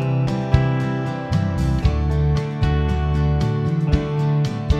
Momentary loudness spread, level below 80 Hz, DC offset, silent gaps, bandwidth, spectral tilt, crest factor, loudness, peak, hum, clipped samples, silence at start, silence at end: 3 LU; -26 dBFS; under 0.1%; none; 8.6 kHz; -8 dB/octave; 18 dB; -20 LUFS; 0 dBFS; none; under 0.1%; 0 s; 0 s